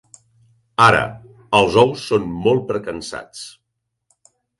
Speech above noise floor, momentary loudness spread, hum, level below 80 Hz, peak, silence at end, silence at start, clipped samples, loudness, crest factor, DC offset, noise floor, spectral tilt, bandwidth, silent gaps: 59 dB; 18 LU; none; -48 dBFS; 0 dBFS; 1.1 s; 0.8 s; under 0.1%; -17 LUFS; 20 dB; under 0.1%; -76 dBFS; -5 dB/octave; 11.5 kHz; none